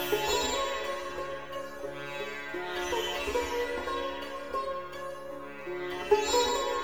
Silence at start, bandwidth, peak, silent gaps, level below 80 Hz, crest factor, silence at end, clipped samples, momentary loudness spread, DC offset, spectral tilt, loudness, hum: 0 s; over 20 kHz; -12 dBFS; none; -54 dBFS; 22 dB; 0 s; under 0.1%; 13 LU; 0.4%; -2.5 dB/octave; -32 LUFS; none